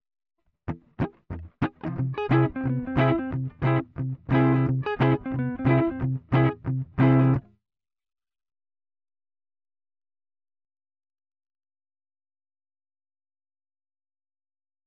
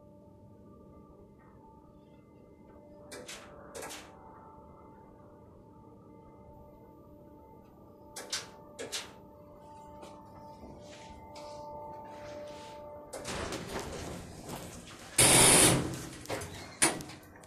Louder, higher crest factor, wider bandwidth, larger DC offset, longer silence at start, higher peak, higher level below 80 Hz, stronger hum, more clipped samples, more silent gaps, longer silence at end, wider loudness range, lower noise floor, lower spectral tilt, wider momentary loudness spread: about the same, -25 LUFS vs -27 LUFS; second, 18 dB vs 28 dB; second, 4.7 kHz vs 14.5 kHz; neither; first, 0.65 s vs 0.1 s; about the same, -10 dBFS vs -8 dBFS; first, -50 dBFS vs -56 dBFS; neither; neither; neither; first, 7.45 s vs 0 s; second, 4 LU vs 24 LU; first, under -90 dBFS vs -56 dBFS; first, -10.5 dB/octave vs -2 dB/octave; second, 12 LU vs 28 LU